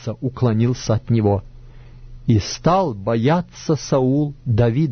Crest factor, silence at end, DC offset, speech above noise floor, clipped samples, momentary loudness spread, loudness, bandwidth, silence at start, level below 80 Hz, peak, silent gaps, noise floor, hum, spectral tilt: 14 dB; 0 s; under 0.1%; 21 dB; under 0.1%; 5 LU; -19 LUFS; 6.6 kHz; 0 s; -40 dBFS; -4 dBFS; none; -40 dBFS; none; -7 dB/octave